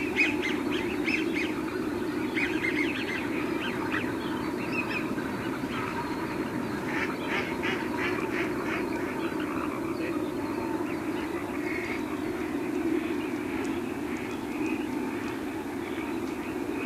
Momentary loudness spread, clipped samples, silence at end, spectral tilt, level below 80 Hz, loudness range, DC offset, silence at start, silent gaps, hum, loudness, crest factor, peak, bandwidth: 5 LU; under 0.1%; 0 s; -5 dB/octave; -56 dBFS; 3 LU; under 0.1%; 0 s; none; none; -30 LUFS; 18 dB; -12 dBFS; 15.5 kHz